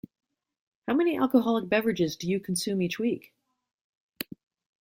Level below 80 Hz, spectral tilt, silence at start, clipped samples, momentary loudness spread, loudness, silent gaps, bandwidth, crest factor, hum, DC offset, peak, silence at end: -68 dBFS; -5 dB/octave; 0.85 s; under 0.1%; 15 LU; -27 LUFS; 3.74-4.13 s; 16.5 kHz; 20 dB; none; under 0.1%; -10 dBFS; 0.55 s